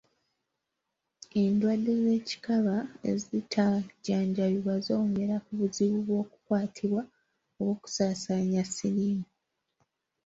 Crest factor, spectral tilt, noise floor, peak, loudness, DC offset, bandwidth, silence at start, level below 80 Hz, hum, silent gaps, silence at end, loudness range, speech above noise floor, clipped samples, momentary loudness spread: 16 dB; -6 dB/octave; -84 dBFS; -14 dBFS; -30 LUFS; under 0.1%; 8 kHz; 1.35 s; -68 dBFS; none; none; 1 s; 2 LU; 56 dB; under 0.1%; 6 LU